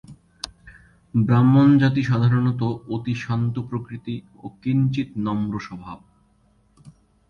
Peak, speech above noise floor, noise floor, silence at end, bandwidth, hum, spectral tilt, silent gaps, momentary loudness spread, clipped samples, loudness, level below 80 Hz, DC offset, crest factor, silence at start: -6 dBFS; 40 dB; -60 dBFS; 0.4 s; 10.5 kHz; none; -8 dB/octave; none; 20 LU; under 0.1%; -21 LUFS; -52 dBFS; under 0.1%; 16 dB; 0.1 s